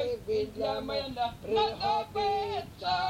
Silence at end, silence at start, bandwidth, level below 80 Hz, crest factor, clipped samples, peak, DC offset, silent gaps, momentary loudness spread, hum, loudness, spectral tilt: 0 s; 0 s; 16.5 kHz; -54 dBFS; 16 dB; under 0.1%; -14 dBFS; under 0.1%; none; 6 LU; none; -31 LUFS; -5 dB/octave